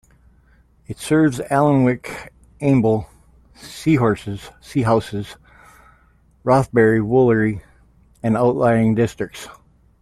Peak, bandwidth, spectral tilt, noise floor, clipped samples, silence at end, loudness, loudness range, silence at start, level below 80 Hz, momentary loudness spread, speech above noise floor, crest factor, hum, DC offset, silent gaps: -2 dBFS; 14 kHz; -7.5 dB/octave; -55 dBFS; under 0.1%; 0.5 s; -18 LUFS; 4 LU; 0.9 s; -48 dBFS; 18 LU; 37 dB; 16 dB; none; under 0.1%; none